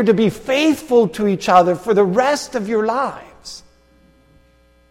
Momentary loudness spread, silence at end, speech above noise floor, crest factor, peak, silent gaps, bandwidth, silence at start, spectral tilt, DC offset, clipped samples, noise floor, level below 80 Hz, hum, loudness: 21 LU; 1.3 s; 38 dB; 18 dB; 0 dBFS; none; 16 kHz; 0 s; -5.5 dB/octave; under 0.1%; under 0.1%; -53 dBFS; -52 dBFS; none; -16 LUFS